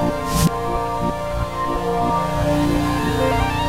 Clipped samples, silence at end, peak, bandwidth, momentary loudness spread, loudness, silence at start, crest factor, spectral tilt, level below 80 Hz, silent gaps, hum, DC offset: under 0.1%; 0 s; -6 dBFS; 16 kHz; 4 LU; -20 LUFS; 0 s; 14 dB; -5.5 dB/octave; -30 dBFS; none; none; 1%